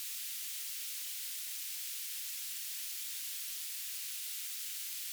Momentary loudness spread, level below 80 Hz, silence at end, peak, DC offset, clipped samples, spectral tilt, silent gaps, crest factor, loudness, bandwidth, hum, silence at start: 0 LU; under -90 dBFS; 0 s; -24 dBFS; under 0.1%; under 0.1%; 10 dB/octave; none; 16 dB; -38 LUFS; over 20 kHz; none; 0 s